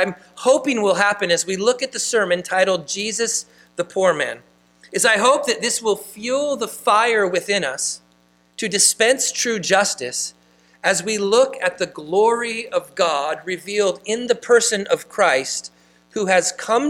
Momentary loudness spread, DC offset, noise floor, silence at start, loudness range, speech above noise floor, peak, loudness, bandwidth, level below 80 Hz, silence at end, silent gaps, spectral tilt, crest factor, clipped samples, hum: 10 LU; under 0.1%; -58 dBFS; 0 s; 2 LU; 38 dB; -2 dBFS; -19 LUFS; 16.5 kHz; -66 dBFS; 0 s; none; -2 dB/octave; 18 dB; under 0.1%; 60 Hz at -55 dBFS